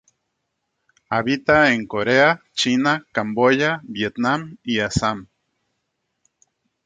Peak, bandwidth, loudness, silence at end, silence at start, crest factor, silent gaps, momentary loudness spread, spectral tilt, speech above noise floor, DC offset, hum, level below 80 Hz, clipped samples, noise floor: -2 dBFS; 9.4 kHz; -19 LUFS; 1.6 s; 1.1 s; 20 dB; none; 9 LU; -4.5 dB/octave; 56 dB; under 0.1%; none; -50 dBFS; under 0.1%; -76 dBFS